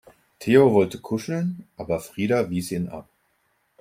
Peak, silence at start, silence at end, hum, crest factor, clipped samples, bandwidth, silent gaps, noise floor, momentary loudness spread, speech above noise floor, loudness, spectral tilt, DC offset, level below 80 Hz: -4 dBFS; 0.4 s; 0.8 s; none; 20 dB; under 0.1%; 16 kHz; none; -69 dBFS; 16 LU; 47 dB; -23 LUFS; -6.5 dB/octave; under 0.1%; -60 dBFS